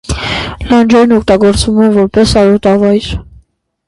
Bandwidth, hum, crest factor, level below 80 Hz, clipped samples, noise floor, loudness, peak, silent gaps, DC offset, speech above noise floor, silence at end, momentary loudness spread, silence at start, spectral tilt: 11.5 kHz; none; 10 dB; -26 dBFS; under 0.1%; -47 dBFS; -9 LUFS; 0 dBFS; none; under 0.1%; 39 dB; 0.65 s; 9 LU; 0.1 s; -5.5 dB/octave